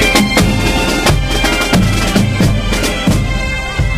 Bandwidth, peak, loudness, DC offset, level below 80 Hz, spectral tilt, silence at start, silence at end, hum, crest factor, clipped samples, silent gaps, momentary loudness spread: 16 kHz; 0 dBFS; -13 LUFS; under 0.1%; -20 dBFS; -4.5 dB/octave; 0 s; 0 s; none; 12 dB; under 0.1%; none; 5 LU